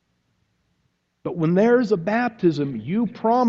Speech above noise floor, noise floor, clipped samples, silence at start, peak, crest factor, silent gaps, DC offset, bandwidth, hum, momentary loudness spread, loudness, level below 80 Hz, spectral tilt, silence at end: 50 dB; -70 dBFS; under 0.1%; 1.25 s; -6 dBFS; 14 dB; none; under 0.1%; 7.4 kHz; none; 9 LU; -21 LUFS; -64 dBFS; -8.5 dB/octave; 0 s